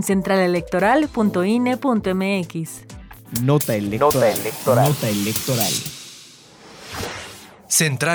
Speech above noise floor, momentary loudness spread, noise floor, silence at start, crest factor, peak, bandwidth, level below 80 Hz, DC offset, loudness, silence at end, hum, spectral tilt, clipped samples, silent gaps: 26 dB; 17 LU; -45 dBFS; 0 s; 16 dB; -4 dBFS; over 20 kHz; -50 dBFS; under 0.1%; -19 LUFS; 0 s; none; -4.5 dB/octave; under 0.1%; none